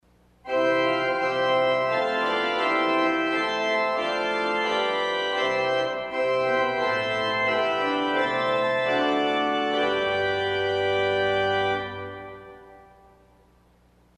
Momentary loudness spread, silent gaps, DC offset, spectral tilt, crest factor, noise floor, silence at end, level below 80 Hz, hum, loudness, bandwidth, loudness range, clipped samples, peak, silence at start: 4 LU; none; under 0.1%; -4.5 dB/octave; 14 dB; -59 dBFS; 1.4 s; -62 dBFS; 60 Hz at -60 dBFS; -24 LUFS; 10.5 kHz; 3 LU; under 0.1%; -10 dBFS; 0.45 s